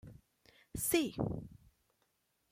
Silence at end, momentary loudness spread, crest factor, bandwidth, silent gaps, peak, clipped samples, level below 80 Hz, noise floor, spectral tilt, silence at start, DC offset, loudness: 0.95 s; 16 LU; 22 dB; 16.5 kHz; none; -18 dBFS; under 0.1%; -60 dBFS; -79 dBFS; -4 dB/octave; 0.05 s; under 0.1%; -36 LUFS